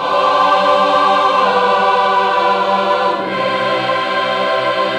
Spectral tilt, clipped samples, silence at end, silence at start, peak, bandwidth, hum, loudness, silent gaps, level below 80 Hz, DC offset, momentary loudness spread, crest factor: -4 dB/octave; under 0.1%; 0 s; 0 s; -2 dBFS; 11.5 kHz; none; -13 LUFS; none; -56 dBFS; under 0.1%; 4 LU; 10 dB